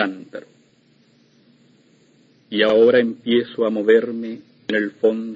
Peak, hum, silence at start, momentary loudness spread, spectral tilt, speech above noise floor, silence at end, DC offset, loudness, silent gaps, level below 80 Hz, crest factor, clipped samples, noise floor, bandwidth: -2 dBFS; none; 0 s; 18 LU; -6.5 dB/octave; 39 dB; 0 s; under 0.1%; -18 LUFS; none; -68 dBFS; 18 dB; under 0.1%; -57 dBFS; 7.2 kHz